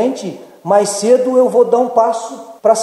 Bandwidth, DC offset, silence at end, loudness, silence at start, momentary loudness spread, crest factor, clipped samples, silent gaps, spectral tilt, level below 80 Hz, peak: 12.5 kHz; under 0.1%; 0 s; -13 LUFS; 0 s; 15 LU; 14 dB; under 0.1%; none; -4.5 dB/octave; -72 dBFS; 0 dBFS